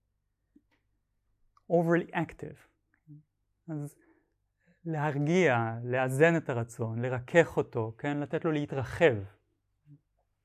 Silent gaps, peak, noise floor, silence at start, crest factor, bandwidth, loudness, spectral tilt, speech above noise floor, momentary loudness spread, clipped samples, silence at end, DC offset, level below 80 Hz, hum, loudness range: none; -8 dBFS; -79 dBFS; 1.7 s; 22 dB; 14 kHz; -29 LUFS; -7 dB/octave; 50 dB; 15 LU; under 0.1%; 0.5 s; under 0.1%; -62 dBFS; none; 7 LU